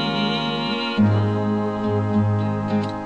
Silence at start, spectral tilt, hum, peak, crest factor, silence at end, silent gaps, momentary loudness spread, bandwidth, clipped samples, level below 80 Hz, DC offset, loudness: 0 s; -7.5 dB/octave; none; -8 dBFS; 14 dB; 0 s; none; 4 LU; 7.8 kHz; under 0.1%; -50 dBFS; 0.3%; -21 LUFS